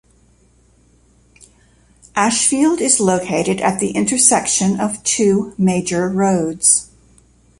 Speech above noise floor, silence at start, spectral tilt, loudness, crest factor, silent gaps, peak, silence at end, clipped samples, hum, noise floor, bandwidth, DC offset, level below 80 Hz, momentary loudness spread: 37 dB; 2.15 s; -3.5 dB/octave; -15 LUFS; 18 dB; none; 0 dBFS; 0.75 s; under 0.1%; none; -53 dBFS; 11.5 kHz; under 0.1%; -52 dBFS; 6 LU